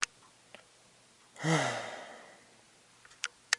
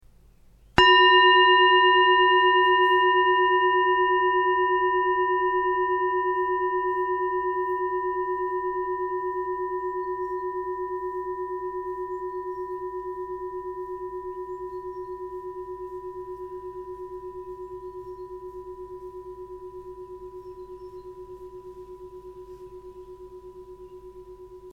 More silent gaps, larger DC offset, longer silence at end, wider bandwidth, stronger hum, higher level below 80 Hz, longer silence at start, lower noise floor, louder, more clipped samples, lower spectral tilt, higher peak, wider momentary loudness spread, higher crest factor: neither; neither; about the same, 0 s vs 0 s; first, 11.5 kHz vs 7.2 kHz; neither; second, -82 dBFS vs -54 dBFS; second, 0 s vs 0.75 s; first, -62 dBFS vs -54 dBFS; second, -35 LUFS vs -22 LUFS; neither; second, -3 dB/octave vs -5 dB/octave; second, -6 dBFS vs 0 dBFS; about the same, 26 LU vs 25 LU; first, 32 dB vs 24 dB